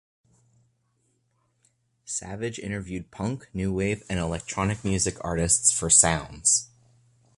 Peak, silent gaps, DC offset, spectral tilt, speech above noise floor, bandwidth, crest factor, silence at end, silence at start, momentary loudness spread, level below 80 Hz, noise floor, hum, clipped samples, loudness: -4 dBFS; none; under 0.1%; -3 dB/octave; 45 dB; 11.5 kHz; 24 dB; 0.7 s; 2.05 s; 16 LU; -46 dBFS; -71 dBFS; none; under 0.1%; -24 LUFS